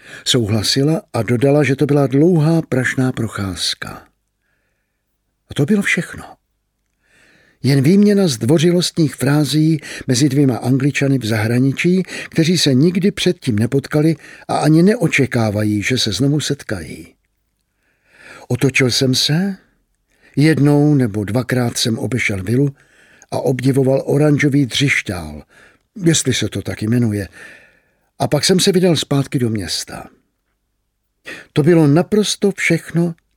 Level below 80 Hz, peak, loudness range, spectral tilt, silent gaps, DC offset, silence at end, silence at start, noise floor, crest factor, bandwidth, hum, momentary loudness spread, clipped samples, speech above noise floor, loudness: -50 dBFS; -2 dBFS; 5 LU; -5.5 dB/octave; none; under 0.1%; 0.25 s; 0.05 s; -69 dBFS; 16 dB; 16.5 kHz; none; 10 LU; under 0.1%; 54 dB; -16 LUFS